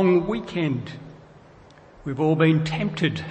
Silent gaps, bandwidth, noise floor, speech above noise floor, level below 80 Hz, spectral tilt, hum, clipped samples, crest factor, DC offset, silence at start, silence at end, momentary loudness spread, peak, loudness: none; 8.6 kHz; -49 dBFS; 27 dB; -52 dBFS; -7.5 dB/octave; none; under 0.1%; 18 dB; under 0.1%; 0 s; 0 s; 18 LU; -6 dBFS; -23 LUFS